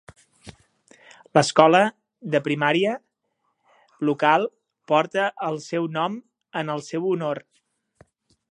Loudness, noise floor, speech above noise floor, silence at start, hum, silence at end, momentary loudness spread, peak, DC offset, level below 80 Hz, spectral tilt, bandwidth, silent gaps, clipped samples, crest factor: -22 LUFS; -74 dBFS; 53 dB; 0.45 s; none; 1.15 s; 14 LU; 0 dBFS; under 0.1%; -68 dBFS; -5 dB/octave; 10.5 kHz; none; under 0.1%; 24 dB